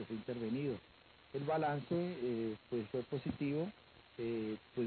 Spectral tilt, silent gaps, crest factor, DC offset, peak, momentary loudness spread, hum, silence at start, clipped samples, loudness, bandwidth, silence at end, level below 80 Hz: -6.5 dB/octave; none; 14 dB; under 0.1%; -26 dBFS; 9 LU; none; 0 s; under 0.1%; -40 LUFS; 4.5 kHz; 0 s; -70 dBFS